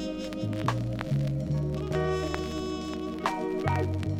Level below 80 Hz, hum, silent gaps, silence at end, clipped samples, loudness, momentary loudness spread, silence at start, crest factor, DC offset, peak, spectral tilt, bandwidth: -44 dBFS; none; none; 0 s; under 0.1%; -30 LUFS; 5 LU; 0 s; 18 dB; under 0.1%; -12 dBFS; -7 dB/octave; 14.5 kHz